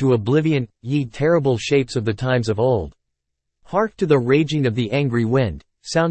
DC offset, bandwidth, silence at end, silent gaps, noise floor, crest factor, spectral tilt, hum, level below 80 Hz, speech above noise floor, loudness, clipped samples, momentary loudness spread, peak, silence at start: under 0.1%; 8.8 kHz; 0 s; none; -78 dBFS; 16 dB; -7 dB/octave; none; -48 dBFS; 59 dB; -20 LUFS; under 0.1%; 6 LU; -2 dBFS; 0 s